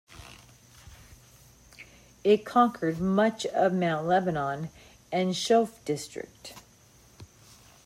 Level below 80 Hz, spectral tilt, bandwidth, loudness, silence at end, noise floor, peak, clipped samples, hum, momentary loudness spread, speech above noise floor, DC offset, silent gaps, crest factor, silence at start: -60 dBFS; -5.5 dB/octave; 15.5 kHz; -27 LUFS; 0.6 s; -57 dBFS; -10 dBFS; under 0.1%; none; 22 LU; 31 dB; under 0.1%; none; 18 dB; 0.1 s